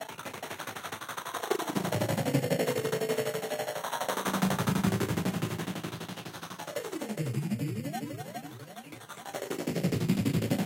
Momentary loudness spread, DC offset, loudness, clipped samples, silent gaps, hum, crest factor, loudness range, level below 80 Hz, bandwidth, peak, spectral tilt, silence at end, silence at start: 12 LU; under 0.1%; -32 LUFS; under 0.1%; none; none; 20 dB; 6 LU; -62 dBFS; 17 kHz; -12 dBFS; -5.5 dB/octave; 0 s; 0 s